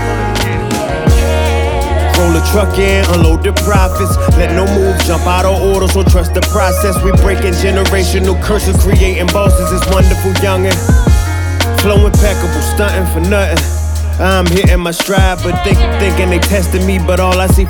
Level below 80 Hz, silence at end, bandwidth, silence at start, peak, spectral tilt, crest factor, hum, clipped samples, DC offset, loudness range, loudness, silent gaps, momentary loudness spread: -16 dBFS; 0 s; 19.5 kHz; 0 s; 0 dBFS; -5.5 dB/octave; 10 dB; none; under 0.1%; under 0.1%; 1 LU; -11 LUFS; none; 4 LU